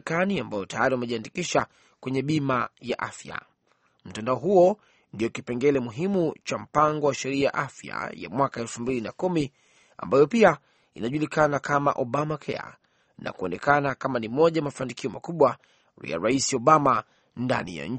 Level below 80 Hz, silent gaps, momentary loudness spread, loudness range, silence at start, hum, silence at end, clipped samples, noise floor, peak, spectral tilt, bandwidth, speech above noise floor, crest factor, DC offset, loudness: -60 dBFS; none; 14 LU; 4 LU; 0.05 s; none; 0 s; under 0.1%; -68 dBFS; -4 dBFS; -5.5 dB/octave; 8.8 kHz; 43 dB; 22 dB; under 0.1%; -25 LUFS